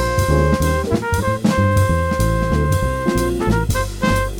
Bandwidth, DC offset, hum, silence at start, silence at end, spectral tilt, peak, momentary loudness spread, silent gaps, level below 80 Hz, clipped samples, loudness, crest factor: 18.5 kHz; under 0.1%; none; 0 s; 0 s; -6 dB/octave; -2 dBFS; 4 LU; none; -24 dBFS; under 0.1%; -18 LUFS; 14 dB